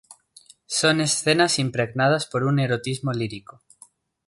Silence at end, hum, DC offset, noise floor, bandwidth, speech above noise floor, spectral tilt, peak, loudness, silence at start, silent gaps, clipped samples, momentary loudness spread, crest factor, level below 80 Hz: 0.9 s; none; under 0.1%; -54 dBFS; 11.5 kHz; 32 dB; -4 dB/octave; -4 dBFS; -22 LUFS; 0.1 s; none; under 0.1%; 8 LU; 20 dB; -62 dBFS